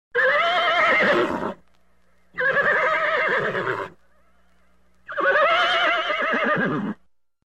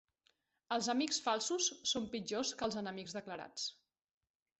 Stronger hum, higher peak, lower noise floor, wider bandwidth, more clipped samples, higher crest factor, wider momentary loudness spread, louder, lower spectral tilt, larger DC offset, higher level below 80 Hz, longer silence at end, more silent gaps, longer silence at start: neither; first, -10 dBFS vs -22 dBFS; second, -64 dBFS vs -79 dBFS; first, 13.5 kHz vs 8.2 kHz; neither; about the same, 14 dB vs 18 dB; first, 14 LU vs 10 LU; first, -20 LUFS vs -38 LUFS; first, -4.5 dB/octave vs -2 dB/octave; first, 0.2% vs under 0.1%; first, -62 dBFS vs -76 dBFS; second, 0.55 s vs 0.85 s; neither; second, 0.15 s vs 0.7 s